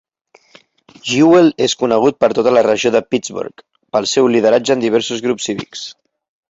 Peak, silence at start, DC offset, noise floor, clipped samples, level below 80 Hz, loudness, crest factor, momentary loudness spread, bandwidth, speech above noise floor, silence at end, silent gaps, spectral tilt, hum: 0 dBFS; 1.05 s; under 0.1%; -53 dBFS; under 0.1%; -56 dBFS; -14 LUFS; 14 dB; 16 LU; 8 kHz; 39 dB; 0.65 s; none; -4.5 dB/octave; none